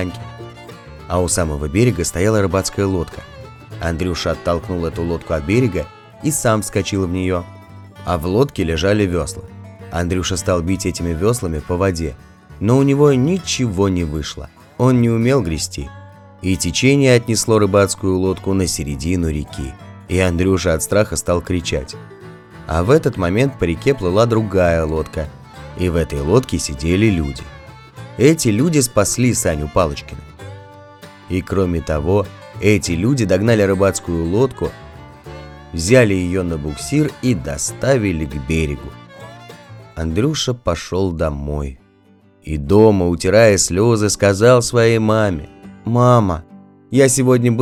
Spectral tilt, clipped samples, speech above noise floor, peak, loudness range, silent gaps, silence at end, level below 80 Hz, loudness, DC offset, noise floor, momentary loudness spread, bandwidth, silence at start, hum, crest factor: -5.5 dB/octave; under 0.1%; 34 dB; 0 dBFS; 6 LU; none; 0 s; -36 dBFS; -17 LUFS; under 0.1%; -50 dBFS; 20 LU; 16 kHz; 0 s; none; 18 dB